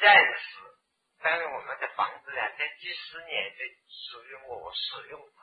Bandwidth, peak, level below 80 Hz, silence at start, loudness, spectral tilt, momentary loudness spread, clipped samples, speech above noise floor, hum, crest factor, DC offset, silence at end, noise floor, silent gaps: 5 kHz; -6 dBFS; -76 dBFS; 0 s; -28 LUFS; -3.5 dB/octave; 15 LU; under 0.1%; 35 dB; none; 24 dB; under 0.1%; 0.2 s; -69 dBFS; none